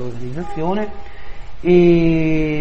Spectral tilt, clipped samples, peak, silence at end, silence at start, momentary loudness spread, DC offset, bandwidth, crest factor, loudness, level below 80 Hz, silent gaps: -8.5 dB/octave; under 0.1%; 0 dBFS; 0 s; 0 s; 16 LU; 6%; 6.6 kHz; 16 dB; -16 LUFS; -32 dBFS; none